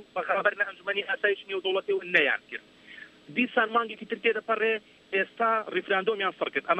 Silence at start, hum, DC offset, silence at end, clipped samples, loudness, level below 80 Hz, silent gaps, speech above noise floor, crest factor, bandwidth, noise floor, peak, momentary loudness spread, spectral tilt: 0 s; none; under 0.1%; 0 s; under 0.1%; -27 LUFS; -78 dBFS; none; 21 dB; 22 dB; 8.2 kHz; -49 dBFS; -6 dBFS; 9 LU; -5 dB/octave